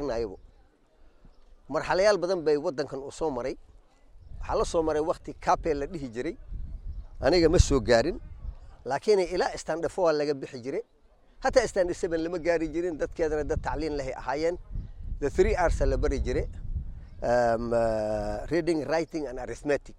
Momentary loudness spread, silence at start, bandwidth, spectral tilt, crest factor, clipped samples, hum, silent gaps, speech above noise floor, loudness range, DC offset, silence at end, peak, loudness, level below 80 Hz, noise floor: 15 LU; 0 s; 11.5 kHz; -5.5 dB/octave; 22 dB; under 0.1%; none; none; 32 dB; 4 LU; under 0.1%; 0 s; -6 dBFS; -28 LUFS; -38 dBFS; -59 dBFS